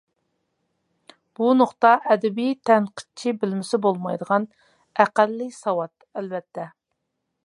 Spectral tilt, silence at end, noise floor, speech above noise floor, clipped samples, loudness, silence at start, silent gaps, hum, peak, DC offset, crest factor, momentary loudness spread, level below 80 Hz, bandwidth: -6 dB/octave; 0.75 s; -78 dBFS; 56 dB; under 0.1%; -22 LUFS; 1.4 s; none; none; -2 dBFS; under 0.1%; 22 dB; 15 LU; -78 dBFS; 11.5 kHz